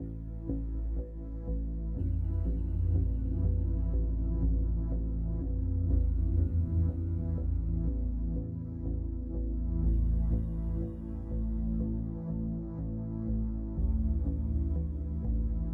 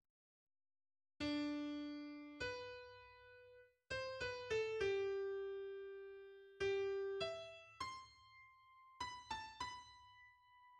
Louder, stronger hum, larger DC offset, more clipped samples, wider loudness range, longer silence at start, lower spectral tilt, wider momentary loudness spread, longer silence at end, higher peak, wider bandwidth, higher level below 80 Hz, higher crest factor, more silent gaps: first, -34 LUFS vs -46 LUFS; neither; neither; neither; about the same, 3 LU vs 5 LU; second, 0 s vs 1.2 s; first, -13 dB/octave vs -4.5 dB/octave; second, 7 LU vs 22 LU; about the same, 0 s vs 0 s; first, -18 dBFS vs -30 dBFS; second, 1.6 kHz vs 10 kHz; first, -32 dBFS vs -72 dBFS; about the same, 14 dB vs 16 dB; neither